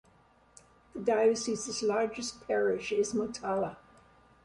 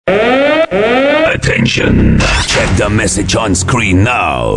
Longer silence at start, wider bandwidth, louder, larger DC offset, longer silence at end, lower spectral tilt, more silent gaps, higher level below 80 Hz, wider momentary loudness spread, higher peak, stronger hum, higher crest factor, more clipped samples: first, 0.95 s vs 0.05 s; about the same, 11.5 kHz vs 11.5 kHz; second, -31 LUFS vs -10 LUFS; second, under 0.1% vs 0.4%; first, 0.7 s vs 0 s; about the same, -3.5 dB/octave vs -4.5 dB/octave; neither; second, -66 dBFS vs -22 dBFS; first, 8 LU vs 2 LU; second, -16 dBFS vs 0 dBFS; neither; first, 16 dB vs 10 dB; neither